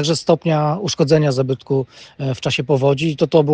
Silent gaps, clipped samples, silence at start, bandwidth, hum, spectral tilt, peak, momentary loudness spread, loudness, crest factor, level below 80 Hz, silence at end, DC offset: none; under 0.1%; 0 s; 9.4 kHz; none; -6 dB/octave; 0 dBFS; 7 LU; -18 LUFS; 16 dB; -54 dBFS; 0 s; under 0.1%